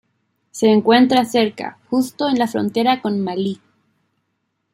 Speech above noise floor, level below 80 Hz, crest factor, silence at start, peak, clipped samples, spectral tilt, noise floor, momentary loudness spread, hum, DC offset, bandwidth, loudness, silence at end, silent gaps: 55 dB; -64 dBFS; 18 dB; 0.55 s; 0 dBFS; under 0.1%; -5 dB/octave; -72 dBFS; 12 LU; none; under 0.1%; 16 kHz; -17 LUFS; 1.2 s; none